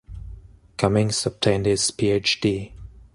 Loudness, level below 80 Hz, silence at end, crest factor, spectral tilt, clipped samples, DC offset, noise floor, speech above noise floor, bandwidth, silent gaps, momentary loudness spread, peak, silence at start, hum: -22 LUFS; -44 dBFS; 0.25 s; 20 dB; -4.5 dB/octave; under 0.1%; under 0.1%; -43 dBFS; 21 dB; 11.5 kHz; none; 20 LU; -4 dBFS; 0.1 s; none